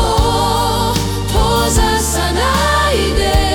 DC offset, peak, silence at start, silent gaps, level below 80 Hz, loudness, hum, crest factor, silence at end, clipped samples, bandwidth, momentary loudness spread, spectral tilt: under 0.1%; 0 dBFS; 0 s; none; -20 dBFS; -14 LUFS; none; 12 dB; 0 s; under 0.1%; 18 kHz; 3 LU; -4 dB/octave